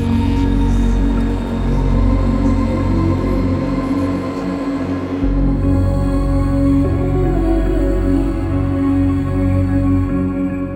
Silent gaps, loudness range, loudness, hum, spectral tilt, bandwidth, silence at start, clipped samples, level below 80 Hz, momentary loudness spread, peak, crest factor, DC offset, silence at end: none; 2 LU; -17 LUFS; none; -9 dB/octave; 9.4 kHz; 0 s; under 0.1%; -20 dBFS; 4 LU; -4 dBFS; 12 dB; under 0.1%; 0 s